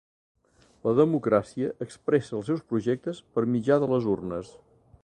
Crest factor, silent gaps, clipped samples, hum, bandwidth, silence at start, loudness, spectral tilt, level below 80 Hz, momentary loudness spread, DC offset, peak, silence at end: 18 dB; none; under 0.1%; none; 9.8 kHz; 0.85 s; -27 LUFS; -8 dB/octave; -62 dBFS; 9 LU; under 0.1%; -8 dBFS; 0.55 s